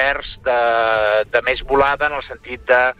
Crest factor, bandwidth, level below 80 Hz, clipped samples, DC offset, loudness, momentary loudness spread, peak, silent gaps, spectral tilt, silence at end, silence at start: 14 dB; 7.4 kHz; -40 dBFS; under 0.1%; under 0.1%; -17 LUFS; 10 LU; -2 dBFS; none; -5.5 dB/octave; 0.05 s; 0 s